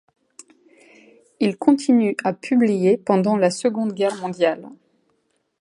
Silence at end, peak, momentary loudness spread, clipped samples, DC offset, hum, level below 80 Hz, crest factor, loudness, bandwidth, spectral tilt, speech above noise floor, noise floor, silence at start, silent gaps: 0.85 s; -2 dBFS; 6 LU; under 0.1%; under 0.1%; none; -70 dBFS; 20 dB; -20 LUFS; 11.5 kHz; -6 dB/octave; 50 dB; -69 dBFS; 1.4 s; none